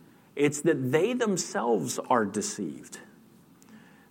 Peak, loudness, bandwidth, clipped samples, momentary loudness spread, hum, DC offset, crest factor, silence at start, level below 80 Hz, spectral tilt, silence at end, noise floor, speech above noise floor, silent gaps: -10 dBFS; -27 LUFS; 16.5 kHz; under 0.1%; 17 LU; none; under 0.1%; 18 dB; 0.35 s; -78 dBFS; -4.5 dB/octave; 0.3 s; -56 dBFS; 29 dB; none